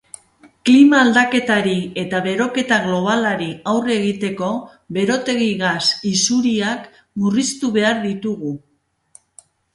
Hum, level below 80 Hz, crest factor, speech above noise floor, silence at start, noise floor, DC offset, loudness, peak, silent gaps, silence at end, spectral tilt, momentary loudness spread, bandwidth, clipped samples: none; -58 dBFS; 18 dB; 34 dB; 0.65 s; -52 dBFS; under 0.1%; -17 LUFS; 0 dBFS; none; 1.15 s; -4 dB/octave; 11 LU; 11.5 kHz; under 0.1%